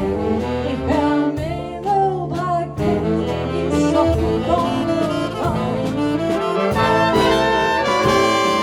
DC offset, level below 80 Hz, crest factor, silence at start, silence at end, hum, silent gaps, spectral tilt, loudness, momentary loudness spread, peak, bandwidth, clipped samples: under 0.1%; -36 dBFS; 14 dB; 0 s; 0 s; none; none; -6 dB/octave; -18 LUFS; 6 LU; -4 dBFS; 16 kHz; under 0.1%